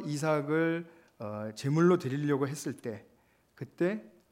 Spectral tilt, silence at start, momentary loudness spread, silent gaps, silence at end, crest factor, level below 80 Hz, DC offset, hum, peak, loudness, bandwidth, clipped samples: -6.5 dB/octave; 0 s; 19 LU; none; 0.25 s; 18 dB; -78 dBFS; under 0.1%; none; -14 dBFS; -31 LUFS; 16 kHz; under 0.1%